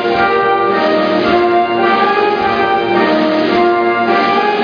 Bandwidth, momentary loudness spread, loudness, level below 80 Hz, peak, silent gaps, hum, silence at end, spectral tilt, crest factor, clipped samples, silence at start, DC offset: 5.2 kHz; 1 LU; -12 LUFS; -46 dBFS; 0 dBFS; none; none; 0 s; -6.5 dB/octave; 12 dB; under 0.1%; 0 s; under 0.1%